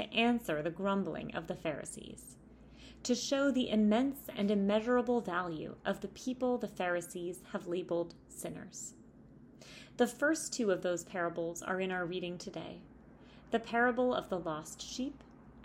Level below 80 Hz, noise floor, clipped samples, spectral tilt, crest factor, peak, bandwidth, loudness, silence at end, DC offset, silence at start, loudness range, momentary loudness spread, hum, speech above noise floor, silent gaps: -64 dBFS; -57 dBFS; under 0.1%; -4.5 dB/octave; 18 dB; -18 dBFS; 16 kHz; -35 LUFS; 0 s; under 0.1%; 0 s; 6 LU; 15 LU; none; 23 dB; none